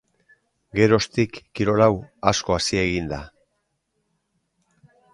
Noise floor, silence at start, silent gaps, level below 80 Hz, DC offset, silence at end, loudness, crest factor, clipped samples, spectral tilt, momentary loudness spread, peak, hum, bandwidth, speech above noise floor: -74 dBFS; 0.75 s; none; -46 dBFS; under 0.1%; 1.85 s; -21 LUFS; 22 dB; under 0.1%; -5 dB/octave; 10 LU; 0 dBFS; none; 11.5 kHz; 53 dB